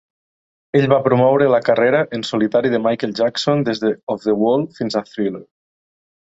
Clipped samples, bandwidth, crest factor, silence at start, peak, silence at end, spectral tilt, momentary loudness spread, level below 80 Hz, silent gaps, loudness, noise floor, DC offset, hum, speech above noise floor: under 0.1%; 8 kHz; 16 dB; 0.75 s; -2 dBFS; 0.75 s; -6.5 dB/octave; 8 LU; -60 dBFS; 4.03-4.07 s; -17 LUFS; under -90 dBFS; under 0.1%; none; over 73 dB